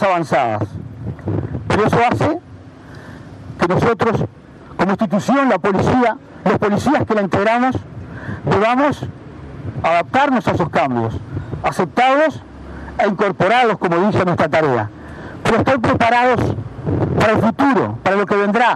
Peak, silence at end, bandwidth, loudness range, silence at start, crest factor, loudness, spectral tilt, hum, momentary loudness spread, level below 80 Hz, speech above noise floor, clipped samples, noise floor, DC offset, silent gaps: -2 dBFS; 0 s; 13 kHz; 3 LU; 0 s; 14 dB; -16 LUFS; -6.5 dB/octave; none; 15 LU; -42 dBFS; 22 dB; under 0.1%; -37 dBFS; under 0.1%; none